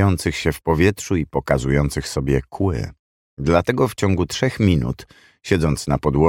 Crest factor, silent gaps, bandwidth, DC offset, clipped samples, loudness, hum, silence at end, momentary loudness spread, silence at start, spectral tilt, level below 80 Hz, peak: 18 dB; 2.99-3.37 s; 17 kHz; under 0.1%; under 0.1%; -20 LUFS; none; 0 s; 7 LU; 0 s; -6 dB/octave; -34 dBFS; 0 dBFS